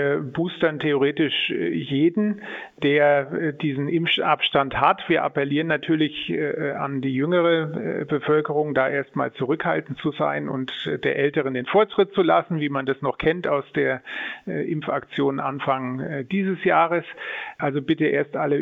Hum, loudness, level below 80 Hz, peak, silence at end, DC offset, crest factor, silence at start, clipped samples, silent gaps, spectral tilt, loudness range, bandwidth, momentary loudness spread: none; -23 LUFS; -60 dBFS; -2 dBFS; 0 s; under 0.1%; 20 dB; 0 s; under 0.1%; none; -8 dB/octave; 3 LU; 4.7 kHz; 8 LU